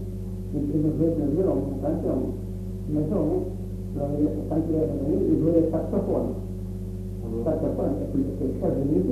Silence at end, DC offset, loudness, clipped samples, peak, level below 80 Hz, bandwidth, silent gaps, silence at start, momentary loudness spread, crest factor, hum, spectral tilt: 0 s; under 0.1%; -26 LUFS; under 0.1%; -10 dBFS; -38 dBFS; 13.5 kHz; none; 0 s; 11 LU; 16 dB; 50 Hz at -35 dBFS; -10.5 dB/octave